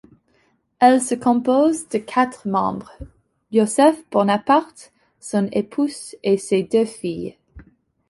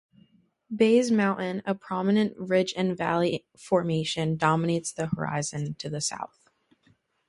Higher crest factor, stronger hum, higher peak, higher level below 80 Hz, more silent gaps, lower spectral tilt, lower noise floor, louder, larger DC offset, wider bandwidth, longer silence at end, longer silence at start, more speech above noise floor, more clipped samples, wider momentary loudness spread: about the same, 18 dB vs 20 dB; neither; first, -2 dBFS vs -8 dBFS; first, -54 dBFS vs -64 dBFS; neither; about the same, -5 dB/octave vs -5.5 dB/octave; about the same, -63 dBFS vs -66 dBFS; first, -19 LUFS vs -26 LUFS; neither; about the same, 11.5 kHz vs 11.5 kHz; second, 0.5 s vs 1.05 s; about the same, 0.8 s vs 0.7 s; first, 44 dB vs 40 dB; neither; about the same, 12 LU vs 10 LU